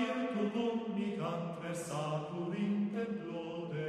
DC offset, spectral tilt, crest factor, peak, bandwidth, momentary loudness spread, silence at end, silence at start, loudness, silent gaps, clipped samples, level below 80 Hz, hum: under 0.1%; -6.5 dB/octave; 14 dB; -24 dBFS; 13 kHz; 6 LU; 0 s; 0 s; -37 LUFS; none; under 0.1%; -76 dBFS; none